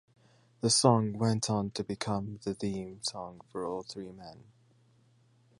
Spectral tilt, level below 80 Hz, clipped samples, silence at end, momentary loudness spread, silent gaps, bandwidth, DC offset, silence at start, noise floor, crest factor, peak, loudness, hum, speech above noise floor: -4.5 dB/octave; -64 dBFS; under 0.1%; 1.2 s; 19 LU; none; 11.5 kHz; under 0.1%; 0.65 s; -65 dBFS; 24 dB; -8 dBFS; -31 LUFS; none; 34 dB